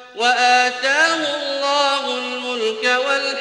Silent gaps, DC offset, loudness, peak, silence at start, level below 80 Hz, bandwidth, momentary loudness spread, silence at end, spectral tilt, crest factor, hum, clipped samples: none; under 0.1%; -17 LUFS; -2 dBFS; 0 s; -70 dBFS; 11 kHz; 8 LU; 0 s; 0 dB/octave; 16 dB; none; under 0.1%